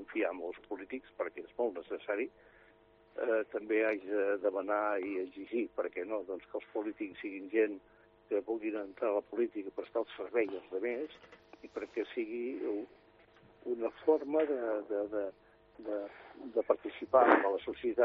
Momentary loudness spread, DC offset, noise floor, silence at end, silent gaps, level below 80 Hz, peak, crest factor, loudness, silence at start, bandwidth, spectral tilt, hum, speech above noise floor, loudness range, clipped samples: 12 LU; under 0.1%; -64 dBFS; 0 s; none; -74 dBFS; -8 dBFS; 26 dB; -35 LUFS; 0 s; 5.4 kHz; -2.5 dB/octave; none; 29 dB; 5 LU; under 0.1%